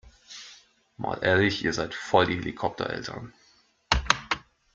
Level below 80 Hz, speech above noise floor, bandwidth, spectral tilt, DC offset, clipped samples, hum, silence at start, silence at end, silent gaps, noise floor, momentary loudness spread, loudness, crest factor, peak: -44 dBFS; 36 dB; 9.4 kHz; -4 dB/octave; under 0.1%; under 0.1%; none; 0.05 s; 0.35 s; none; -63 dBFS; 20 LU; -26 LUFS; 26 dB; -2 dBFS